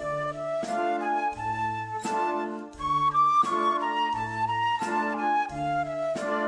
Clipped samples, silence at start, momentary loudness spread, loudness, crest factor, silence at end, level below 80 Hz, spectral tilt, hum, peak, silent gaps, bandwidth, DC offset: under 0.1%; 0 s; 8 LU; -27 LUFS; 14 dB; 0 s; -56 dBFS; -5 dB/octave; none; -14 dBFS; none; 10.5 kHz; under 0.1%